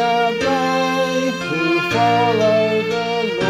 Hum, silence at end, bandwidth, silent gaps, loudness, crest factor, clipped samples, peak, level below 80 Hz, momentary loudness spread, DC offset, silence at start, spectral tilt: none; 0 s; 15 kHz; none; -17 LUFS; 12 dB; under 0.1%; -4 dBFS; -52 dBFS; 5 LU; under 0.1%; 0 s; -5 dB/octave